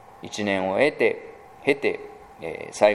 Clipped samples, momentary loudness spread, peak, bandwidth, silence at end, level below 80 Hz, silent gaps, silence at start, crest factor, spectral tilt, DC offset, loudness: under 0.1%; 16 LU; -4 dBFS; 13.5 kHz; 0 s; -62 dBFS; none; 0.15 s; 20 dB; -4.5 dB/octave; under 0.1%; -24 LUFS